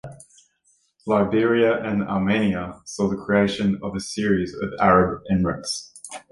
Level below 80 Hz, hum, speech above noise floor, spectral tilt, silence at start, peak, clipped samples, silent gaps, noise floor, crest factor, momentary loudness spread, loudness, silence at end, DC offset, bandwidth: -46 dBFS; none; 44 dB; -6 dB/octave; 0.05 s; -4 dBFS; under 0.1%; none; -65 dBFS; 20 dB; 12 LU; -22 LUFS; 0.1 s; under 0.1%; 11.5 kHz